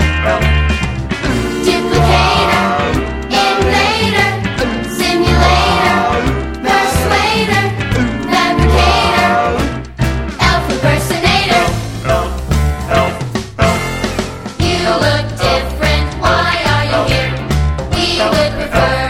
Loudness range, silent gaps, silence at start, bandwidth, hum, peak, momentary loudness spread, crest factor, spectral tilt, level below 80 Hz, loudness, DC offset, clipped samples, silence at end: 3 LU; none; 0 s; 16 kHz; none; 0 dBFS; 7 LU; 12 dB; -5 dB/octave; -22 dBFS; -13 LUFS; under 0.1%; under 0.1%; 0 s